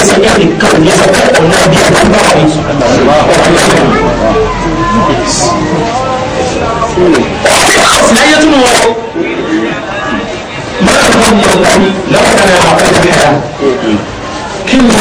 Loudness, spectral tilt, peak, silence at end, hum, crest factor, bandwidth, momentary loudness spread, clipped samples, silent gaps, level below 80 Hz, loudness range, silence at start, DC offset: -7 LUFS; -4 dB/octave; 0 dBFS; 0 s; none; 6 dB; 11 kHz; 9 LU; 2%; none; -26 dBFS; 3 LU; 0 s; under 0.1%